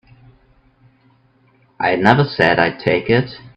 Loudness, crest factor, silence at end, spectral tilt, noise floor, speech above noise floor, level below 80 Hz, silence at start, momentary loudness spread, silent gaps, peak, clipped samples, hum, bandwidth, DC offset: -15 LUFS; 18 dB; 0.1 s; -7.5 dB/octave; -55 dBFS; 40 dB; -50 dBFS; 1.8 s; 6 LU; none; 0 dBFS; under 0.1%; none; 8.4 kHz; under 0.1%